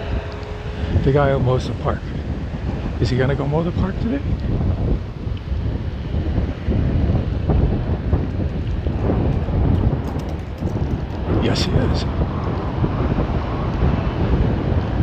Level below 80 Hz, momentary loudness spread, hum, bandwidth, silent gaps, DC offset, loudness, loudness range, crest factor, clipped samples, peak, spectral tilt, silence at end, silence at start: -26 dBFS; 8 LU; none; 8.4 kHz; none; under 0.1%; -21 LUFS; 2 LU; 16 dB; under 0.1%; -4 dBFS; -8 dB/octave; 0 s; 0 s